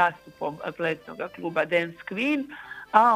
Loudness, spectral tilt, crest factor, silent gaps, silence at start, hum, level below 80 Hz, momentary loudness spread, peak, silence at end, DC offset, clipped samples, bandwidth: -27 LUFS; -6 dB/octave; 24 dB; none; 0 s; 50 Hz at -65 dBFS; -68 dBFS; 11 LU; -2 dBFS; 0 s; under 0.1%; under 0.1%; 15 kHz